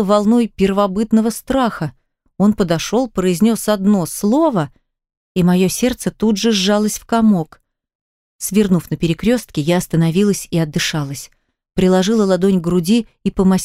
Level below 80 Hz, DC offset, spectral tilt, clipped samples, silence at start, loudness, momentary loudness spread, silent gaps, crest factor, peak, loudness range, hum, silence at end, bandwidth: -42 dBFS; under 0.1%; -5.5 dB/octave; under 0.1%; 0 s; -16 LUFS; 6 LU; 5.17-5.35 s, 7.95-8.39 s; 14 dB; -2 dBFS; 1 LU; none; 0 s; 16 kHz